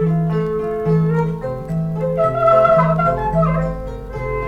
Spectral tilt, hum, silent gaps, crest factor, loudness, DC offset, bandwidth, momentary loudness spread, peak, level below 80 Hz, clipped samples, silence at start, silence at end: -9.5 dB/octave; none; none; 16 dB; -17 LUFS; under 0.1%; 5.2 kHz; 12 LU; -2 dBFS; -34 dBFS; under 0.1%; 0 s; 0 s